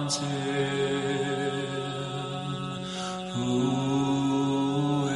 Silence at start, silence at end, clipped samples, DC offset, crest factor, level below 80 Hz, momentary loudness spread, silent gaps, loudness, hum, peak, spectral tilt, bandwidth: 0 s; 0 s; under 0.1%; under 0.1%; 14 dB; -60 dBFS; 7 LU; none; -28 LUFS; none; -14 dBFS; -5.5 dB/octave; 11.5 kHz